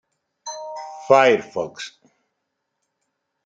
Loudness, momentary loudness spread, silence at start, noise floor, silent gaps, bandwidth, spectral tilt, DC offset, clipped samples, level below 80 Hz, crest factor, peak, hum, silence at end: -18 LUFS; 21 LU; 0.45 s; -77 dBFS; none; 7.8 kHz; -3.5 dB/octave; under 0.1%; under 0.1%; -72 dBFS; 22 dB; -2 dBFS; none; 1.55 s